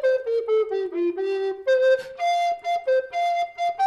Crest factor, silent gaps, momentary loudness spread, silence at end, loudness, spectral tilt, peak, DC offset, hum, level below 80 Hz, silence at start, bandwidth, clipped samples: 12 dB; none; 5 LU; 0 s; -23 LUFS; -3 dB/octave; -12 dBFS; under 0.1%; none; -70 dBFS; 0 s; 11 kHz; under 0.1%